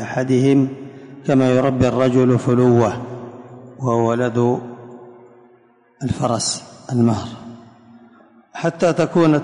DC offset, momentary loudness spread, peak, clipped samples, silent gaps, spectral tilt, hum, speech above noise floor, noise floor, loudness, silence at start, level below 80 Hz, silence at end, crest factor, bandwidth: under 0.1%; 22 LU; -4 dBFS; under 0.1%; none; -6.5 dB/octave; none; 37 dB; -53 dBFS; -18 LUFS; 0 s; -48 dBFS; 0 s; 14 dB; 11 kHz